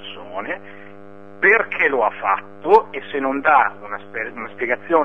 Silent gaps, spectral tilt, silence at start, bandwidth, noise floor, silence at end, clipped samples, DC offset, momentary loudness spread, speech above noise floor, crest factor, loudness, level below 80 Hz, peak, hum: none; -6 dB/octave; 0 s; 6.2 kHz; -41 dBFS; 0 s; under 0.1%; 0.9%; 14 LU; 22 dB; 20 dB; -19 LUFS; -62 dBFS; 0 dBFS; none